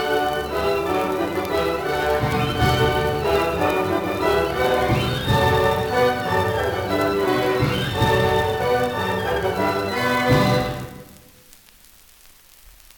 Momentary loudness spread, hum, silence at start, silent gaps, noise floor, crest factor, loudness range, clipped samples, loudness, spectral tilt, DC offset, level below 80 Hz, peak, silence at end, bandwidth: 5 LU; none; 0 s; none; -50 dBFS; 16 dB; 3 LU; under 0.1%; -20 LUFS; -5.5 dB/octave; under 0.1%; -40 dBFS; -6 dBFS; 1.85 s; 18 kHz